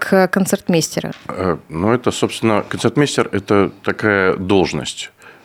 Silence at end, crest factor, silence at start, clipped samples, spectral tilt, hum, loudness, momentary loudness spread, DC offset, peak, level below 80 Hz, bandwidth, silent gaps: 0.15 s; 16 dB; 0 s; under 0.1%; -5 dB/octave; none; -17 LUFS; 9 LU; under 0.1%; 0 dBFS; -50 dBFS; 16.5 kHz; none